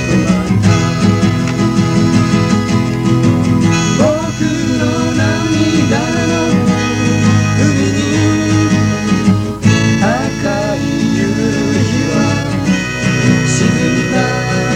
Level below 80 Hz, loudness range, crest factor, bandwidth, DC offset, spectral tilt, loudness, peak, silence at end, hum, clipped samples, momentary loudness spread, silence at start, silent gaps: -34 dBFS; 1 LU; 12 dB; 15 kHz; under 0.1%; -5.5 dB/octave; -13 LUFS; 0 dBFS; 0 s; none; under 0.1%; 3 LU; 0 s; none